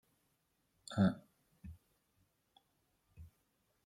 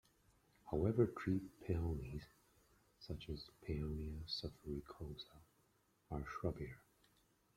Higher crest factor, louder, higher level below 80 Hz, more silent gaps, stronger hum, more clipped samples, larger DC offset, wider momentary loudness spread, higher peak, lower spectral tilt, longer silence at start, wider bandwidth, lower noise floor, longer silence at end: about the same, 24 dB vs 24 dB; first, -36 LUFS vs -44 LUFS; second, -70 dBFS vs -58 dBFS; neither; neither; neither; neither; first, 24 LU vs 16 LU; about the same, -20 dBFS vs -22 dBFS; about the same, -7 dB/octave vs -7.5 dB/octave; first, 0.9 s vs 0.65 s; second, 10.5 kHz vs 15.5 kHz; about the same, -80 dBFS vs -78 dBFS; second, 0.6 s vs 0.8 s